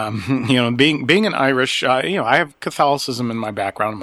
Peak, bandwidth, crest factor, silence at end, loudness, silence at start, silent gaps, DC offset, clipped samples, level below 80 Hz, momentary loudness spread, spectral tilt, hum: 0 dBFS; 13.5 kHz; 18 dB; 0 s; -17 LUFS; 0 s; none; under 0.1%; under 0.1%; -58 dBFS; 8 LU; -5 dB/octave; none